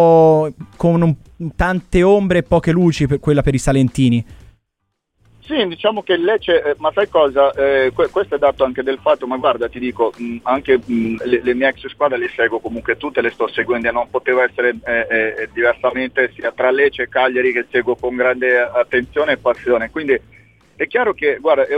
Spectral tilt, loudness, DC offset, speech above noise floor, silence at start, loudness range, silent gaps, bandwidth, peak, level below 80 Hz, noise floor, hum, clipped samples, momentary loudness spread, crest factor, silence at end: -6.5 dB/octave; -16 LUFS; under 0.1%; 57 dB; 0 s; 3 LU; none; 11.5 kHz; -2 dBFS; -38 dBFS; -73 dBFS; none; under 0.1%; 6 LU; 14 dB; 0 s